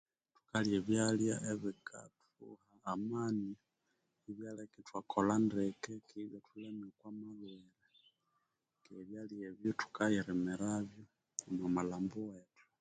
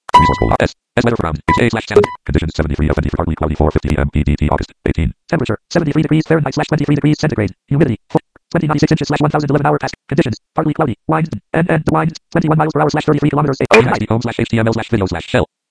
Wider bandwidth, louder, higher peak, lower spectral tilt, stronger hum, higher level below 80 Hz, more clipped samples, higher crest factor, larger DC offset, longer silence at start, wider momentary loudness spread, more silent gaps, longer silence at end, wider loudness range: second, 9.4 kHz vs 11 kHz; second, -39 LUFS vs -15 LUFS; second, -18 dBFS vs 0 dBFS; second, -5.5 dB/octave vs -7 dB/octave; neither; second, -72 dBFS vs -28 dBFS; second, under 0.1% vs 0.1%; first, 22 dB vs 14 dB; neither; first, 0.55 s vs 0.15 s; first, 19 LU vs 5 LU; neither; first, 0.4 s vs 0.25 s; first, 10 LU vs 2 LU